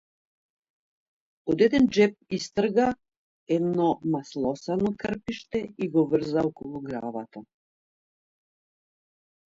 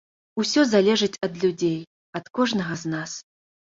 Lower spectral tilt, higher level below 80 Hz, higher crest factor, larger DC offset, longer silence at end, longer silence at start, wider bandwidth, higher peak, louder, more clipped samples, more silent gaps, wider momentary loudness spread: first, -6.5 dB/octave vs -4.5 dB/octave; about the same, -60 dBFS vs -64 dBFS; about the same, 20 dB vs 18 dB; neither; first, 2.15 s vs 0.5 s; first, 1.45 s vs 0.35 s; about the same, 7.8 kHz vs 7.8 kHz; about the same, -8 dBFS vs -6 dBFS; second, -26 LUFS vs -23 LUFS; neither; about the same, 3.17-3.46 s vs 1.87-2.13 s; about the same, 14 LU vs 16 LU